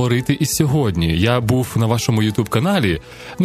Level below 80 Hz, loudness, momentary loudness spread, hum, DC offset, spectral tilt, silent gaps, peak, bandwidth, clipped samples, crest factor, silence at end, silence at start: -38 dBFS; -17 LUFS; 2 LU; none; 0.1%; -5.5 dB/octave; none; 0 dBFS; 14.5 kHz; under 0.1%; 16 dB; 0 s; 0 s